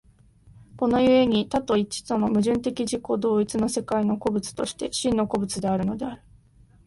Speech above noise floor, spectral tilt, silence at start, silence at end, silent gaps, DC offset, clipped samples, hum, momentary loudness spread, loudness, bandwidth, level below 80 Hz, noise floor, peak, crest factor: 32 dB; -5 dB/octave; 0.75 s; 0.7 s; none; under 0.1%; under 0.1%; none; 9 LU; -24 LUFS; 11.5 kHz; -52 dBFS; -55 dBFS; -8 dBFS; 16 dB